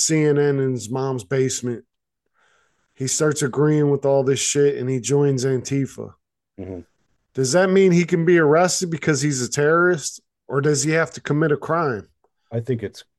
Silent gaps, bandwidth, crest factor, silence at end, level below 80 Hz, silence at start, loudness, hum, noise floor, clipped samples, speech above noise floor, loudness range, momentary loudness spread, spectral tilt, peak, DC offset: none; 12.5 kHz; 16 dB; 0.15 s; -62 dBFS; 0 s; -20 LUFS; none; -73 dBFS; under 0.1%; 54 dB; 5 LU; 14 LU; -5 dB/octave; -6 dBFS; under 0.1%